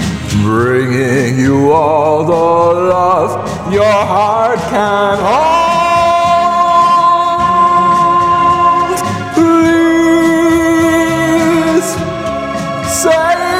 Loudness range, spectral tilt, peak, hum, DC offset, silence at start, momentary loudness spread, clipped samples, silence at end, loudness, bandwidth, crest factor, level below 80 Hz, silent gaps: 2 LU; -5.5 dB/octave; 0 dBFS; none; 0.1%; 0 s; 6 LU; under 0.1%; 0 s; -10 LUFS; 16 kHz; 10 dB; -40 dBFS; none